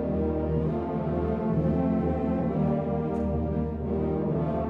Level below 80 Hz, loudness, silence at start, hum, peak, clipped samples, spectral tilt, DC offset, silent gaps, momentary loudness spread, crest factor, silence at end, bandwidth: -38 dBFS; -28 LUFS; 0 s; none; -14 dBFS; under 0.1%; -11.5 dB/octave; under 0.1%; none; 3 LU; 12 dB; 0 s; 4.6 kHz